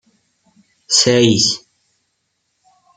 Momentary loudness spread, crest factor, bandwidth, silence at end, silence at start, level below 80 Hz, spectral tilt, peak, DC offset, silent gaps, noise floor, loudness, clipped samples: 6 LU; 20 dB; 10 kHz; 1.4 s; 0.9 s; -58 dBFS; -3 dB/octave; 0 dBFS; under 0.1%; none; -69 dBFS; -13 LUFS; under 0.1%